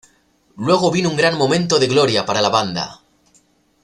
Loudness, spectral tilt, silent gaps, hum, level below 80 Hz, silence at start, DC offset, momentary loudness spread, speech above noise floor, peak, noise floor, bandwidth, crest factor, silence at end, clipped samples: -16 LUFS; -4.5 dB/octave; none; none; -56 dBFS; 0.55 s; under 0.1%; 10 LU; 41 dB; -2 dBFS; -58 dBFS; 12 kHz; 16 dB; 0.9 s; under 0.1%